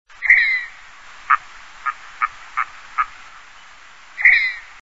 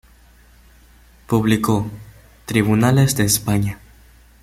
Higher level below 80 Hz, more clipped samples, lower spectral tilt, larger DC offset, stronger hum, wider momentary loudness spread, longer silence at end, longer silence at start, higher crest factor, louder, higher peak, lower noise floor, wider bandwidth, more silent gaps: second, -52 dBFS vs -44 dBFS; neither; second, 1 dB/octave vs -5 dB/octave; first, 0.5% vs under 0.1%; neither; second, 15 LU vs 18 LU; second, 0.2 s vs 0.7 s; second, 0.2 s vs 1.3 s; about the same, 20 dB vs 18 dB; about the same, -17 LUFS vs -18 LUFS; about the same, 0 dBFS vs -2 dBFS; second, -44 dBFS vs -49 dBFS; second, 8 kHz vs 16 kHz; neither